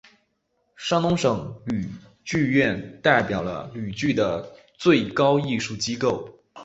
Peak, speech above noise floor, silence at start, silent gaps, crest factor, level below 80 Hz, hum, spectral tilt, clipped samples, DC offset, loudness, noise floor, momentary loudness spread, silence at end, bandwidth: -2 dBFS; 49 dB; 0.8 s; none; 22 dB; -54 dBFS; none; -5.5 dB/octave; under 0.1%; under 0.1%; -23 LUFS; -72 dBFS; 12 LU; 0 s; 8 kHz